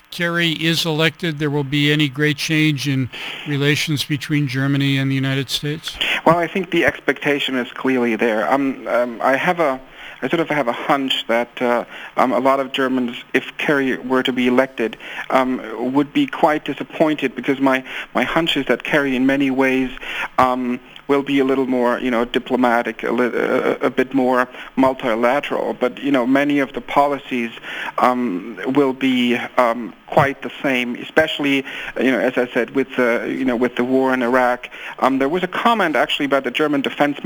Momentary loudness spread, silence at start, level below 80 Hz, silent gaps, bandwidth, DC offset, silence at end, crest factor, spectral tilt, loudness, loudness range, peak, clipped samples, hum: 6 LU; 0.1 s; -52 dBFS; none; over 20 kHz; under 0.1%; 0 s; 18 dB; -5.5 dB/octave; -18 LUFS; 1 LU; 0 dBFS; under 0.1%; none